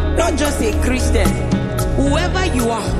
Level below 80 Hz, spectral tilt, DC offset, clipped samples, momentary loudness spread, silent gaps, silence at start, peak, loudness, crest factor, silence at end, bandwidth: -20 dBFS; -5.5 dB/octave; under 0.1%; under 0.1%; 3 LU; none; 0 s; -2 dBFS; -17 LUFS; 14 dB; 0 s; 14 kHz